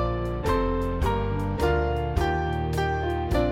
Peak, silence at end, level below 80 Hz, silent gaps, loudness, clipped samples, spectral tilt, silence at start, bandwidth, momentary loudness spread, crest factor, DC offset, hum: -10 dBFS; 0 s; -30 dBFS; none; -26 LUFS; under 0.1%; -7 dB/octave; 0 s; 16 kHz; 3 LU; 14 dB; 0.2%; none